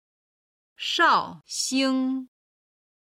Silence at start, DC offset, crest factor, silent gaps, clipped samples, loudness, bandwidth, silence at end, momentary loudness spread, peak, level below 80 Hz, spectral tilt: 0.8 s; under 0.1%; 18 dB; none; under 0.1%; -24 LUFS; 15 kHz; 0.75 s; 13 LU; -8 dBFS; -72 dBFS; -1.5 dB/octave